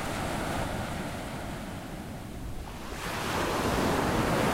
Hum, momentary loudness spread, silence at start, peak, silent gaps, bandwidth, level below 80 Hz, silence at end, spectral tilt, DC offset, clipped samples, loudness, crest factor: none; 13 LU; 0 s; -14 dBFS; none; 16 kHz; -42 dBFS; 0 s; -5 dB/octave; under 0.1%; under 0.1%; -32 LUFS; 16 dB